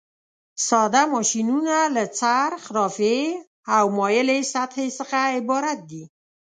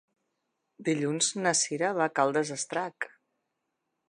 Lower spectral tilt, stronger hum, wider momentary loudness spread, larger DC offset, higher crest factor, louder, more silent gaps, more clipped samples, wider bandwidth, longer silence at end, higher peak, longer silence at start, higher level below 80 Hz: about the same, -3 dB/octave vs -3 dB/octave; neither; about the same, 9 LU vs 10 LU; neither; about the same, 18 dB vs 20 dB; first, -21 LUFS vs -28 LUFS; first, 3.47-3.63 s vs none; neither; second, 9.6 kHz vs 11 kHz; second, 0.4 s vs 1 s; first, -4 dBFS vs -10 dBFS; second, 0.55 s vs 0.8 s; first, -74 dBFS vs -84 dBFS